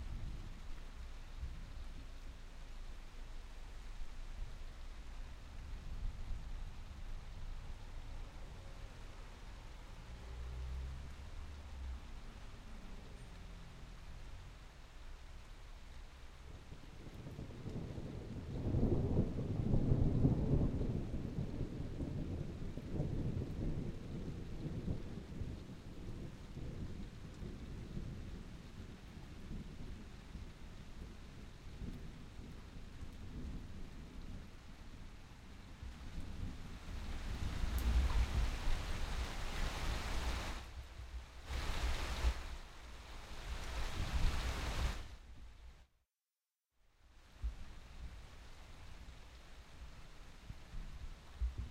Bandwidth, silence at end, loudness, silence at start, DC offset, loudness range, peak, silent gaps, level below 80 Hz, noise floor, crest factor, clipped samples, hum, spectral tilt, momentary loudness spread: 15.5 kHz; 0 s; -45 LUFS; 0 s; under 0.1%; 16 LU; -18 dBFS; none; -44 dBFS; under -90 dBFS; 24 dB; under 0.1%; none; -6 dB/octave; 18 LU